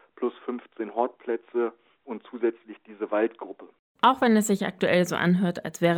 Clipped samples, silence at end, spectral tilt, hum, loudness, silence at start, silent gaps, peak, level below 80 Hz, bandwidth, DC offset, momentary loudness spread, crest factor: under 0.1%; 0 s; -5.5 dB/octave; none; -26 LUFS; 0.2 s; 3.79-3.95 s; -6 dBFS; -70 dBFS; 19 kHz; under 0.1%; 18 LU; 20 dB